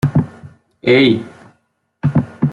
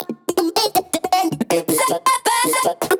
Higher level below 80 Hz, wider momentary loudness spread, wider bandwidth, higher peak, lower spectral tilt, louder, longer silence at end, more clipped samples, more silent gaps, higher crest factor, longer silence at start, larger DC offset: first, -48 dBFS vs -62 dBFS; first, 14 LU vs 4 LU; second, 10 kHz vs over 20 kHz; first, -2 dBFS vs -6 dBFS; first, -8 dB/octave vs -2.5 dB/octave; first, -15 LUFS vs -18 LUFS; about the same, 0 s vs 0 s; neither; neither; about the same, 14 dB vs 14 dB; about the same, 0.05 s vs 0 s; neither